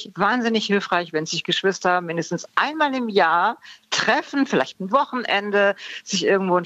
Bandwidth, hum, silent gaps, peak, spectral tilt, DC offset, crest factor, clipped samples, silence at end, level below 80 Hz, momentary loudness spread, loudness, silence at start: 9.2 kHz; none; none; -4 dBFS; -4 dB/octave; under 0.1%; 16 dB; under 0.1%; 0 s; -70 dBFS; 6 LU; -21 LUFS; 0 s